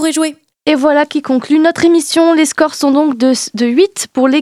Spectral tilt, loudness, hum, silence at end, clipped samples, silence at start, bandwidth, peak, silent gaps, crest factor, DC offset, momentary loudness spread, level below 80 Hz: -3 dB/octave; -12 LUFS; none; 0 s; under 0.1%; 0 s; 14 kHz; 0 dBFS; none; 12 dB; under 0.1%; 5 LU; -60 dBFS